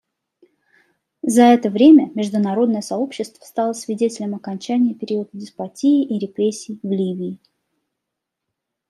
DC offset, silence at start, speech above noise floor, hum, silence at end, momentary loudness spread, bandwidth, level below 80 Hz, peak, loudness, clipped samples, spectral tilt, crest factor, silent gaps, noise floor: under 0.1%; 1.25 s; 63 dB; none; 1.55 s; 16 LU; 13.5 kHz; -70 dBFS; -2 dBFS; -18 LUFS; under 0.1%; -6 dB/octave; 18 dB; none; -81 dBFS